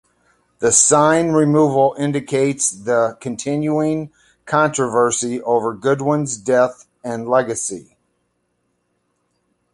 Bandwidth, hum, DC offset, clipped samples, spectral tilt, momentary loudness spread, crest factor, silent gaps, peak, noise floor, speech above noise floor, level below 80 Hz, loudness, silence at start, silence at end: 11.5 kHz; none; under 0.1%; under 0.1%; -4.5 dB/octave; 12 LU; 18 dB; none; 0 dBFS; -69 dBFS; 52 dB; -58 dBFS; -17 LUFS; 0.6 s; 1.9 s